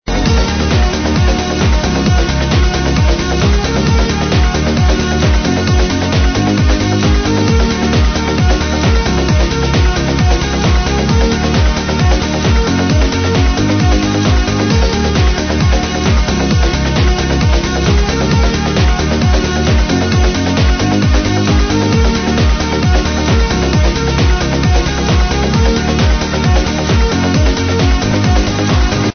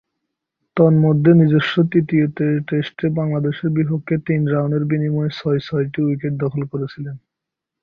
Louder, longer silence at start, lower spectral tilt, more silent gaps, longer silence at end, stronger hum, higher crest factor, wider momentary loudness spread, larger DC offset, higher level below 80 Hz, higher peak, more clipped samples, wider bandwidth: first, -13 LUFS vs -18 LUFS; second, 0.05 s vs 0.75 s; second, -5.5 dB/octave vs -9.5 dB/octave; neither; second, 0 s vs 0.65 s; neither; second, 10 dB vs 16 dB; second, 1 LU vs 12 LU; neither; first, -14 dBFS vs -56 dBFS; about the same, 0 dBFS vs -2 dBFS; neither; first, 6.6 kHz vs 5.2 kHz